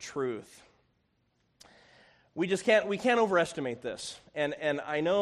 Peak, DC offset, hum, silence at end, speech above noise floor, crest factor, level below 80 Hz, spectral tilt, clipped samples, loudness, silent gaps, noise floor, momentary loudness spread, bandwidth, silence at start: -12 dBFS; under 0.1%; none; 0 s; 44 dB; 20 dB; -70 dBFS; -4.5 dB/octave; under 0.1%; -30 LUFS; none; -74 dBFS; 13 LU; 12.5 kHz; 0 s